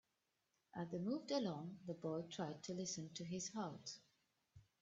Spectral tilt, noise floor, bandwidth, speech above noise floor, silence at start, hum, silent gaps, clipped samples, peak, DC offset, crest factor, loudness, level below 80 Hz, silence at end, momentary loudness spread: -5 dB/octave; -88 dBFS; 8.2 kHz; 41 dB; 0.75 s; none; none; under 0.1%; -30 dBFS; under 0.1%; 18 dB; -47 LUFS; -84 dBFS; 0.2 s; 10 LU